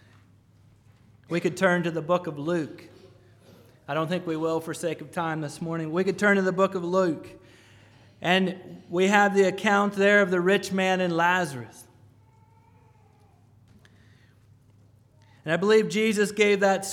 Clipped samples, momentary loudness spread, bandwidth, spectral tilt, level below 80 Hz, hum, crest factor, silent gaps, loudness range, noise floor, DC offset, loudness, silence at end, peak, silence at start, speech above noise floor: under 0.1%; 12 LU; 16.5 kHz; -5 dB/octave; -70 dBFS; none; 22 dB; none; 8 LU; -57 dBFS; under 0.1%; -24 LUFS; 0 s; -6 dBFS; 1.3 s; 33 dB